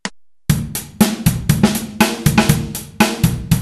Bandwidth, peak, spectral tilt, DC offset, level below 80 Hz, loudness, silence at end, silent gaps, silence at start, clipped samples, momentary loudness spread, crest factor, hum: 13.5 kHz; 0 dBFS; -5 dB/octave; under 0.1%; -32 dBFS; -16 LUFS; 0 s; none; 0.05 s; under 0.1%; 10 LU; 16 dB; none